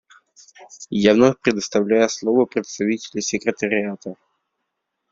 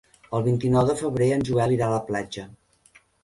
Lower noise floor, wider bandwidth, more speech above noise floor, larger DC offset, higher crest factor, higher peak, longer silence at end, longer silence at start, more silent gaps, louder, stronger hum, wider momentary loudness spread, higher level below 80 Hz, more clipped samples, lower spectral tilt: first, -77 dBFS vs -58 dBFS; second, 7.8 kHz vs 11.5 kHz; first, 58 dB vs 35 dB; neither; about the same, 20 dB vs 16 dB; first, -2 dBFS vs -8 dBFS; first, 1 s vs 0.7 s; first, 0.6 s vs 0.3 s; neither; first, -20 LUFS vs -23 LUFS; neither; first, 13 LU vs 9 LU; second, -60 dBFS vs -52 dBFS; neither; second, -4.5 dB/octave vs -7 dB/octave